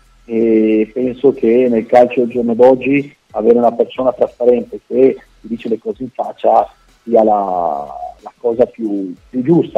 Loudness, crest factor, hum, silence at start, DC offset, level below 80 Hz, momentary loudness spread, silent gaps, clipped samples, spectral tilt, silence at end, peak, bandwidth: -14 LUFS; 14 dB; none; 0.3 s; under 0.1%; -50 dBFS; 13 LU; none; under 0.1%; -8.5 dB/octave; 0.1 s; 0 dBFS; 7.2 kHz